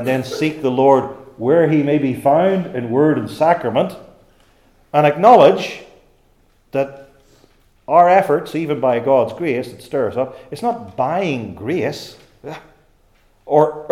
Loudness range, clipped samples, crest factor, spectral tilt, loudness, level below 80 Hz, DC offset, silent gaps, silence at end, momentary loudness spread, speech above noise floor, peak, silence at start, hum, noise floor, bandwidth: 7 LU; under 0.1%; 18 dB; -7 dB/octave; -16 LUFS; -56 dBFS; under 0.1%; none; 0.05 s; 14 LU; 40 dB; 0 dBFS; 0 s; none; -55 dBFS; 15.5 kHz